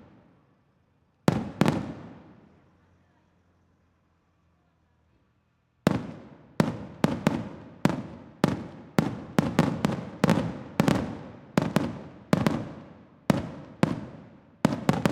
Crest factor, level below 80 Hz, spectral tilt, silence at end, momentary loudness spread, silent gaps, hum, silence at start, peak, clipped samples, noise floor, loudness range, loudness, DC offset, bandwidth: 26 dB; -56 dBFS; -6.5 dB/octave; 0 s; 16 LU; none; none; 1.3 s; -4 dBFS; under 0.1%; -69 dBFS; 7 LU; -28 LUFS; under 0.1%; 16.5 kHz